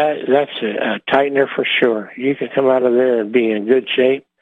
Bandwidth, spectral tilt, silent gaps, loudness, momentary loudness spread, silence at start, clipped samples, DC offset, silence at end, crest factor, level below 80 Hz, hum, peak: 4.1 kHz; -7 dB/octave; none; -16 LUFS; 6 LU; 0 s; under 0.1%; under 0.1%; 0.2 s; 14 dB; -66 dBFS; none; -2 dBFS